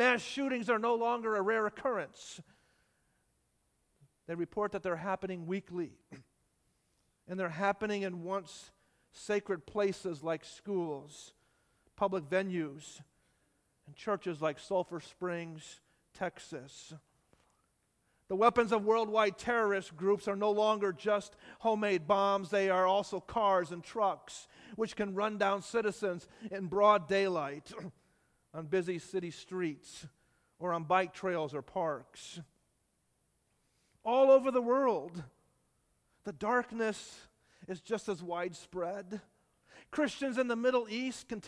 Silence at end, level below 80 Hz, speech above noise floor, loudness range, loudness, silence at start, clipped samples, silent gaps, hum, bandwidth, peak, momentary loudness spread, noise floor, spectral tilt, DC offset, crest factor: 0 s; -72 dBFS; 43 dB; 8 LU; -33 LUFS; 0 s; under 0.1%; none; none; 11 kHz; -12 dBFS; 18 LU; -77 dBFS; -5 dB/octave; under 0.1%; 22 dB